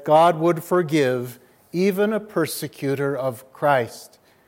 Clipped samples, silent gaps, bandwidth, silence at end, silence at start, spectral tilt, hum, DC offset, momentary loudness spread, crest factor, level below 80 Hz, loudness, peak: under 0.1%; none; 17 kHz; 0.4 s; 0 s; -6 dB/octave; none; under 0.1%; 12 LU; 16 dB; -72 dBFS; -22 LUFS; -4 dBFS